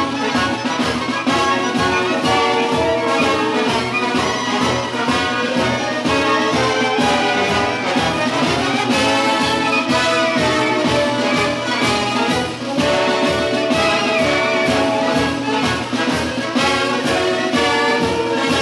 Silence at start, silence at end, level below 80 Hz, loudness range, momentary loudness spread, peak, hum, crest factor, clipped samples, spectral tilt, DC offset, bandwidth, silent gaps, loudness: 0 s; 0 s; -44 dBFS; 1 LU; 3 LU; -2 dBFS; none; 14 dB; under 0.1%; -4 dB/octave; under 0.1%; 12.5 kHz; none; -16 LUFS